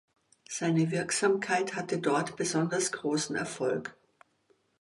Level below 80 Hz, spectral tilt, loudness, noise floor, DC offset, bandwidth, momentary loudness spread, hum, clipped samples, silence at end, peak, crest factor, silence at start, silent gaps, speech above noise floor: -74 dBFS; -4.5 dB/octave; -30 LUFS; -70 dBFS; under 0.1%; 11.5 kHz; 6 LU; none; under 0.1%; 0.9 s; -14 dBFS; 16 dB; 0.5 s; none; 41 dB